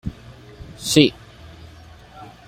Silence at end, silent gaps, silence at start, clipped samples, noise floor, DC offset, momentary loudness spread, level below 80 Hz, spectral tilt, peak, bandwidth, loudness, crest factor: 0.25 s; none; 0.05 s; under 0.1%; -44 dBFS; under 0.1%; 27 LU; -46 dBFS; -4.5 dB/octave; -2 dBFS; 16 kHz; -18 LUFS; 22 dB